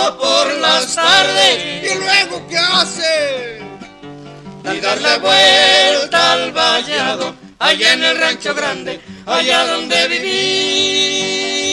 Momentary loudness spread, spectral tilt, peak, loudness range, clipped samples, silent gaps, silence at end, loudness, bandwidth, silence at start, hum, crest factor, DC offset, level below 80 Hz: 12 LU; -1 dB/octave; 0 dBFS; 4 LU; under 0.1%; none; 0 s; -12 LUFS; 13.5 kHz; 0 s; none; 14 dB; under 0.1%; -54 dBFS